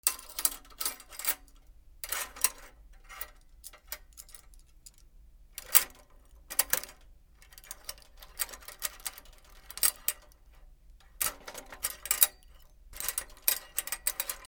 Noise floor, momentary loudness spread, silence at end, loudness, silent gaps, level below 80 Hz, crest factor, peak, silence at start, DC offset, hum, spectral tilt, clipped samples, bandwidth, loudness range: -56 dBFS; 24 LU; 0 s; -30 LUFS; none; -56 dBFS; 36 dB; 0 dBFS; 0.05 s; under 0.1%; none; 1.5 dB/octave; under 0.1%; over 20 kHz; 6 LU